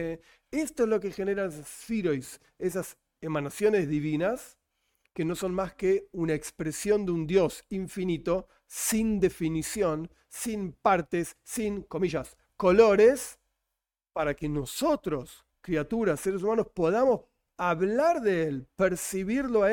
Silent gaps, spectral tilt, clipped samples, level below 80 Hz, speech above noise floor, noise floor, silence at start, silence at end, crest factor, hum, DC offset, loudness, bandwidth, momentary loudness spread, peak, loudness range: none; -5.5 dB/octave; under 0.1%; -54 dBFS; 59 dB; -87 dBFS; 0 s; 0 s; 20 dB; none; under 0.1%; -28 LUFS; 17 kHz; 11 LU; -8 dBFS; 5 LU